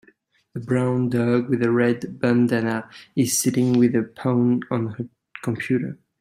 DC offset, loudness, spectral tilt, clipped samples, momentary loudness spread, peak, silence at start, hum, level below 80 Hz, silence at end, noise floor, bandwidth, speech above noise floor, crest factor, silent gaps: under 0.1%; -22 LUFS; -6 dB/octave; under 0.1%; 12 LU; -6 dBFS; 0.55 s; none; -62 dBFS; 0.25 s; -59 dBFS; 16 kHz; 38 dB; 16 dB; none